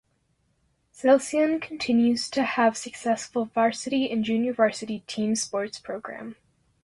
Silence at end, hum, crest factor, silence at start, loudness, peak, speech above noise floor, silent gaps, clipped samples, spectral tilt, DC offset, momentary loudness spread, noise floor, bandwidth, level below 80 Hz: 0.5 s; none; 18 dB; 1 s; -25 LUFS; -8 dBFS; 45 dB; none; under 0.1%; -4 dB/octave; under 0.1%; 13 LU; -70 dBFS; 11.5 kHz; -66 dBFS